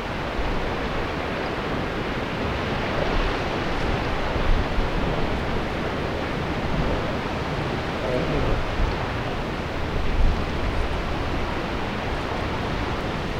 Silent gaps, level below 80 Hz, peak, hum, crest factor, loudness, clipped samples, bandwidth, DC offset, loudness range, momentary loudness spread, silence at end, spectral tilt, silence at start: none; -30 dBFS; -8 dBFS; none; 16 dB; -26 LUFS; under 0.1%; 12 kHz; under 0.1%; 1 LU; 3 LU; 0 s; -6 dB/octave; 0 s